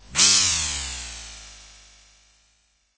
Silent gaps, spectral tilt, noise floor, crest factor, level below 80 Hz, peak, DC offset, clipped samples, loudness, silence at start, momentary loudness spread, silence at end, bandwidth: none; 1 dB/octave; -65 dBFS; 22 dB; -44 dBFS; -4 dBFS; under 0.1%; under 0.1%; -18 LUFS; 0.1 s; 24 LU; 1.35 s; 8 kHz